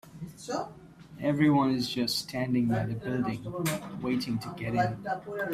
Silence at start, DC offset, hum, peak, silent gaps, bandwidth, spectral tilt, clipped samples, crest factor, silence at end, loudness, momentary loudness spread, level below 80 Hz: 0.05 s; under 0.1%; none; -12 dBFS; none; 16 kHz; -5.5 dB/octave; under 0.1%; 18 dB; 0 s; -30 LUFS; 11 LU; -60 dBFS